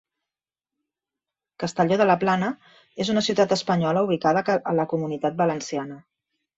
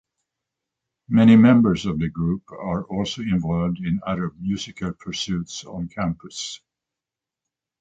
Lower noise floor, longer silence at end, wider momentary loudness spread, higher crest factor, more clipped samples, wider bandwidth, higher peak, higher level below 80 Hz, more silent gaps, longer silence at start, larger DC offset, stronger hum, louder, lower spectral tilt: about the same, under -90 dBFS vs -88 dBFS; second, 0.6 s vs 1.25 s; second, 11 LU vs 17 LU; about the same, 20 dB vs 18 dB; neither; about the same, 8 kHz vs 8 kHz; about the same, -6 dBFS vs -4 dBFS; second, -64 dBFS vs -48 dBFS; neither; first, 1.6 s vs 1.1 s; neither; neither; about the same, -23 LUFS vs -21 LUFS; about the same, -5.5 dB/octave vs -6.5 dB/octave